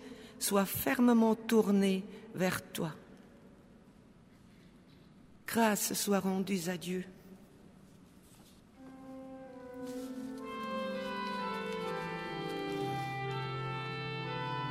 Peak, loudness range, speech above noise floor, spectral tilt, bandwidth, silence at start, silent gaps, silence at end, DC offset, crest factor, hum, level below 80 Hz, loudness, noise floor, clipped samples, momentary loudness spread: -14 dBFS; 13 LU; 28 dB; -4.5 dB/octave; 16 kHz; 0 s; none; 0 s; under 0.1%; 20 dB; none; -68 dBFS; -34 LUFS; -59 dBFS; under 0.1%; 20 LU